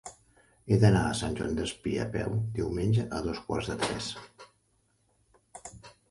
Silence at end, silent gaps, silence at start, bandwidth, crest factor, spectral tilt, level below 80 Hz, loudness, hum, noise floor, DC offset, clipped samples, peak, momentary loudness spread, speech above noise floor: 0.2 s; none; 0.05 s; 11.5 kHz; 22 dB; -6 dB/octave; -48 dBFS; -30 LUFS; none; -71 dBFS; under 0.1%; under 0.1%; -8 dBFS; 22 LU; 43 dB